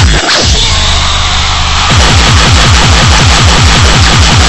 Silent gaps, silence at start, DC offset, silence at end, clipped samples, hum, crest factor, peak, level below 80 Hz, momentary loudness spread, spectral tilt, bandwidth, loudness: none; 0 s; under 0.1%; 0 s; 8%; none; 6 dB; 0 dBFS; -10 dBFS; 4 LU; -3 dB/octave; 11 kHz; -5 LUFS